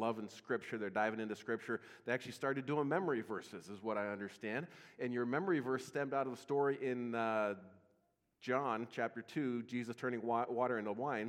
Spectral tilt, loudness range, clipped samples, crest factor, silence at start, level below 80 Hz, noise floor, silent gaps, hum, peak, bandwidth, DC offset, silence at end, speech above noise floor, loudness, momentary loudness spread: -6.5 dB/octave; 2 LU; under 0.1%; 20 dB; 0 s; -90 dBFS; -79 dBFS; none; none; -20 dBFS; 15.5 kHz; under 0.1%; 0 s; 40 dB; -40 LUFS; 8 LU